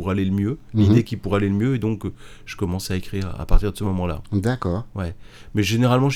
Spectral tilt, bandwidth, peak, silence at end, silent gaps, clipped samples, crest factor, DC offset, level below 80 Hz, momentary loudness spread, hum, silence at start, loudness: -7 dB/octave; 15.5 kHz; -2 dBFS; 0 s; none; under 0.1%; 20 dB; under 0.1%; -28 dBFS; 13 LU; none; 0 s; -23 LUFS